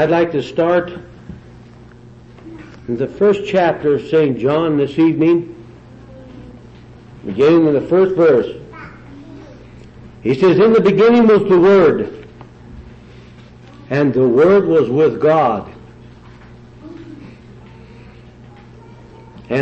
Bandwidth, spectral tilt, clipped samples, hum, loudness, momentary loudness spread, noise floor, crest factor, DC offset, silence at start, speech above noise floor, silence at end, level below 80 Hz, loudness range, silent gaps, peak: 7.8 kHz; -8 dB/octave; under 0.1%; none; -13 LUFS; 25 LU; -40 dBFS; 12 dB; under 0.1%; 0 s; 27 dB; 0 s; -48 dBFS; 7 LU; none; -4 dBFS